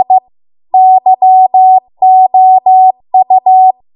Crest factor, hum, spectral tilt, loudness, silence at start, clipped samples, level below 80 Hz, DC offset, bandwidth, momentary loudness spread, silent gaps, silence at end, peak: 6 dB; none; -9 dB/octave; -7 LUFS; 0 s; under 0.1%; -68 dBFS; under 0.1%; 1 kHz; 5 LU; none; 0.25 s; 0 dBFS